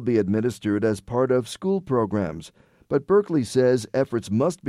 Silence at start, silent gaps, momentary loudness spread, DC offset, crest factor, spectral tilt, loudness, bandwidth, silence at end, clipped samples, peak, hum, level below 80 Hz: 0 s; none; 6 LU; under 0.1%; 14 dB; -7 dB/octave; -23 LUFS; 13.5 kHz; 0 s; under 0.1%; -8 dBFS; none; -56 dBFS